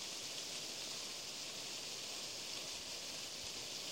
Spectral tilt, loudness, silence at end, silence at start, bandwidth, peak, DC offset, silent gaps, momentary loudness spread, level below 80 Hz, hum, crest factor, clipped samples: 0 dB/octave; -43 LUFS; 0 s; 0 s; 16 kHz; -30 dBFS; under 0.1%; none; 1 LU; -76 dBFS; none; 16 dB; under 0.1%